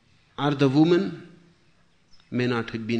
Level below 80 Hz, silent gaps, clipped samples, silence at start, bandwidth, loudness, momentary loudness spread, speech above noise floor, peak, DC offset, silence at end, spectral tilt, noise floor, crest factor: -62 dBFS; none; under 0.1%; 0.4 s; 8.6 kHz; -23 LUFS; 16 LU; 41 dB; -8 dBFS; under 0.1%; 0 s; -7.5 dB/octave; -63 dBFS; 18 dB